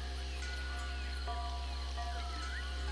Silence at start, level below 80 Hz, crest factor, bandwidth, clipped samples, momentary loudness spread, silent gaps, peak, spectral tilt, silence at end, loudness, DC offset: 0 s; -40 dBFS; 12 dB; 11 kHz; under 0.1%; 1 LU; none; -28 dBFS; -4 dB/octave; 0 s; -41 LUFS; under 0.1%